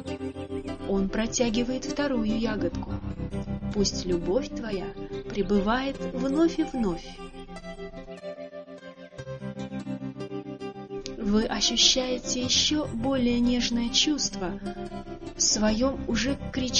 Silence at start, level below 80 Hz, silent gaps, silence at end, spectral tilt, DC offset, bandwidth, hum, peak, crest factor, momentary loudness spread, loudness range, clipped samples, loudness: 0 s; -42 dBFS; none; 0 s; -3.5 dB/octave; under 0.1%; 9.4 kHz; none; -4 dBFS; 22 dB; 18 LU; 13 LU; under 0.1%; -27 LUFS